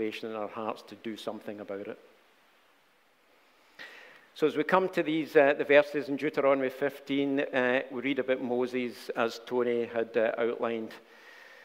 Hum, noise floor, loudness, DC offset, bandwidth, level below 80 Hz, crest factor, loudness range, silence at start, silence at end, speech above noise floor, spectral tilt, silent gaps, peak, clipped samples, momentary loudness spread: none; -66 dBFS; -29 LUFS; under 0.1%; 16 kHz; -78 dBFS; 24 dB; 15 LU; 0 s; 0.1 s; 37 dB; -5.5 dB/octave; none; -8 dBFS; under 0.1%; 19 LU